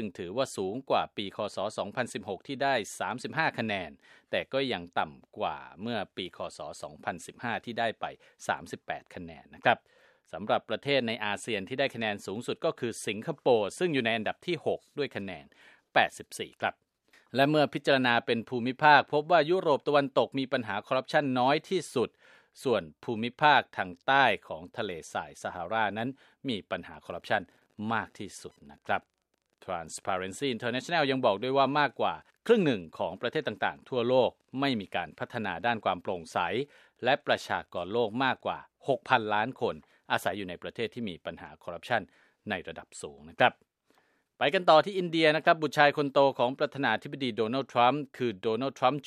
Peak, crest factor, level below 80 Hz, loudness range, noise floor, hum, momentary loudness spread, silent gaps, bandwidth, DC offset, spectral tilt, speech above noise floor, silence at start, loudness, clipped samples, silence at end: -6 dBFS; 24 dB; -70 dBFS; 9 LU; -78 dBFS; none; 14 LU; none; 14 kHz; under 0.1%; -4.5 dB/octave; 48 dB; 0 s; -30 LUFS; under 0.1%; 0 s